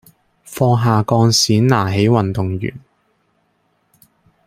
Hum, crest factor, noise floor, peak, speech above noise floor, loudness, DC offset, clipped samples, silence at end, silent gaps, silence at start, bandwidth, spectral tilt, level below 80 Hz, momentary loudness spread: none; 16 dB; -63 dBFS; -2 dBFS; 49 dB; -15 LUFS; under 0.1%; under 0.1%; 1.7 s; none; 0.5 s; 15.5 kHz; -5.5 dB/octave; -50 dBFS; 11 LU